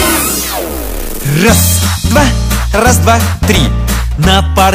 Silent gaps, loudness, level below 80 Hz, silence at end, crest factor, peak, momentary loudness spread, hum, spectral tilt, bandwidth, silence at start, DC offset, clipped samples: none; -10 LUFS; -16 dBFS; 0 s; 10 dB; 0 dBFS; 9 LU; none; -4 dB/octave; 16.5 kHz; 0 s; under 0.1%; 0.6%